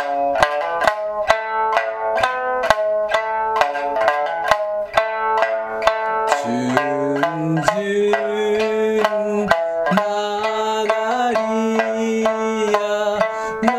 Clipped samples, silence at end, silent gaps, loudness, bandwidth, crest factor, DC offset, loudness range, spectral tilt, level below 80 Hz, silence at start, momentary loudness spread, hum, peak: under 0.1%; 0 s; none; -19 LUFS; 14 kHz; 18 dB; under 0.1%; 1 LU; -4.5 dB/octave; -52 dBFS; 0 s; 2 LU; none; 0 dBFS